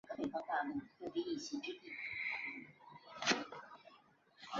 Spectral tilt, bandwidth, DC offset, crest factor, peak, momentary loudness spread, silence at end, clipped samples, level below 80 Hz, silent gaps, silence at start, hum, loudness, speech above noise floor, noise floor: -1 dB/octave; 7.6 kHz; under 0.1%; 28 dB; -16 dBFS; 21 LU; 0 s; under 0.1%; -80 dBFS; none; 0.05 s; none; -42 LUFS; 25 dB; -68 dBFS